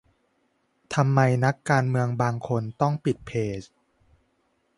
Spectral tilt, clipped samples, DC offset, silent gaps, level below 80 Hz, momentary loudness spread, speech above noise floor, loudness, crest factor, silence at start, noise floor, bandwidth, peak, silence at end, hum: -7 dB/octave; under 0.1%; under 0.1%; none; -58 dBFS; 9 LU; 46 dB; -25 LUFS; 20 dB; 0.9 s; -70 dBFS; 11.5 kHz; -6 dBFS; 1.1 s; none